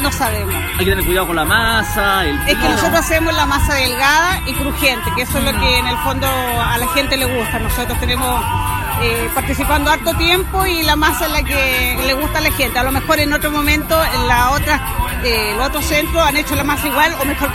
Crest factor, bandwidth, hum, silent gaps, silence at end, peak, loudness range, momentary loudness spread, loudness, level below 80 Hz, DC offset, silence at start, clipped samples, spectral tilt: 16 dB; 16.5 kHz; none; none; 0 s; 0 dBFS; 2 LU; 4 LU; -15 LUFS; -24 dBFS; under 0.1%; 0 s; under 0.1%; -3.5 dB/octave